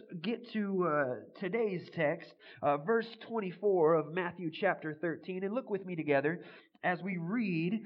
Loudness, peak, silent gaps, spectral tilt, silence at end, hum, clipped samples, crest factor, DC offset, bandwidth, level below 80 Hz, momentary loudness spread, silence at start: -34 LUFS; -16 dBFS; none; -9.5 dB/octave; 0 s; none; under 0.1%; 18 dB; under 0.1%; 5.6 kHz; -86 dBFS; 8 LU; 0.1 s